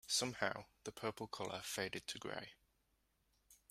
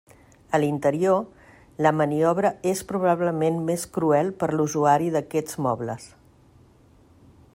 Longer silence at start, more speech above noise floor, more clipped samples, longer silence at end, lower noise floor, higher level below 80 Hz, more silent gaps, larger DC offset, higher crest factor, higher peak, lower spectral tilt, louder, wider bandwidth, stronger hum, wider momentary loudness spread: second, 0.05 s vs 0.5 s; first, 36 dB vs 32 dB; neither; second, 0.15 s vs 1.5 s; first, -81 dBFS vs -55 dBFS; second, -76 dBFS vs -60 dBFS; neither; neither; first, 26 dB vs 20 dB; second, -20 dBFS vs -4 dBFS; second, -2 dB/octave vs -6.5 dB/octave; second, -44 LUFS vs -23 LUFS; about the same, 16 kHz vs 16 kHz; neither; first, 11 LU vs 6 LU